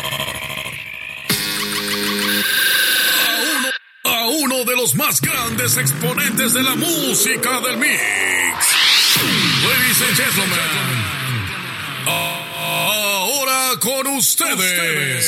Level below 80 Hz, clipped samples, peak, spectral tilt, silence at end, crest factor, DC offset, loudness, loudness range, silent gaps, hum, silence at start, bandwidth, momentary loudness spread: -54 dBFS; under 0.1%; -2 dBFS; -1.5 dB/octave; 0 s; 16 dB; under 0.1%; -15 LUFS; 4 LU; none; none; 0 s; 17 kHz; 9 LU